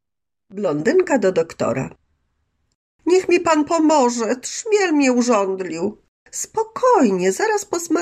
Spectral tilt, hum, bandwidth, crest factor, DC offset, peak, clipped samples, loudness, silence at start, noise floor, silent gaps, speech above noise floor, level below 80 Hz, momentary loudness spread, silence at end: -4.5 dB/octave; none; 15 kHz; 14 dB; under 0.1%; -4 dBFS; under 0.1%; -18 LUFS; 0.5 s; -83 dBFS; 2.75-2.99 s, 6.08-6.26 s; 65 dB; -60 dBFS; 11 LU; 0 s